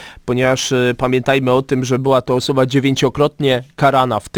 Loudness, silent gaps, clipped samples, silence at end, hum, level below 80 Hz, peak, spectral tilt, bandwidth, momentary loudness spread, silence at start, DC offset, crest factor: -15 LUFS; none; under 0.1%; 0 s; none; -44 dBFS; -2 dBFS; -5.5 dB/octave; 19 kHz; 3 LU; 0 s; under 0.1%; 12 dB